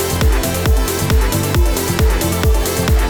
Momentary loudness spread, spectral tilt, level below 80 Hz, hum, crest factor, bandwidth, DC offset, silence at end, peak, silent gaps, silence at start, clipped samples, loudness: 1 LU; -4.5 dB/octave; -16 dBFS; none; 12 dB; over 20 kHz; under 0.1%; 0 s; -2 dBFS; none; 0 s; under 0.1%; -16 LUFS